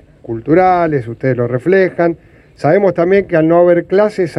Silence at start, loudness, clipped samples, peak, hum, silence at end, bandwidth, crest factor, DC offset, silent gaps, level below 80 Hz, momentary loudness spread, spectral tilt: 0.3 s; -12 LUFS; under 0.1%; 0 dBFS; none; 0 s; 10.5 kHz; 12 dB; under 0.1%; none; -46 dBFS; 8 LU; -8.5 dB/octave